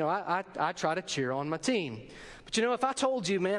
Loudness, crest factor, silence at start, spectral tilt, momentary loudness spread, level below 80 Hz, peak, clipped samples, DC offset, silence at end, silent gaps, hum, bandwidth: -31 LUFS; 16 dB; 0 s; -4 dB/octave; 10 LU; -64 dBFS; -14 dBFS; under 0.1%; under 0.1%; 0 s; none; none; 11.5 kHz